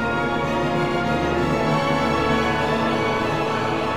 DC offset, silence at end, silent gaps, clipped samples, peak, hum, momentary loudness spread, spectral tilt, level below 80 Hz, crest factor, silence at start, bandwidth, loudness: 0.8%; 0 s; none; under 0.1%; -8 dBFS; none; 2 LU; -6 dB/octave; -40 dBFS; 14 dB; 0 s; 16 kHz; -21 LUFS